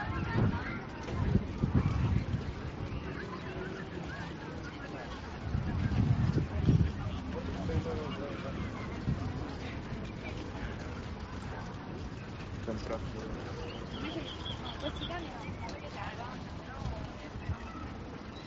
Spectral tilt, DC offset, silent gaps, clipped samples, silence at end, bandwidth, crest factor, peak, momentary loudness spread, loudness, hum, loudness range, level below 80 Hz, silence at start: -6 dB/octave; under 0.1%; none; under 0.1%; 0 s; 7.6 kHz; 22 dB; -14 dBFS; 12 LU; -37 LUFS; none; 8 LU; -44 dBFS; 0 s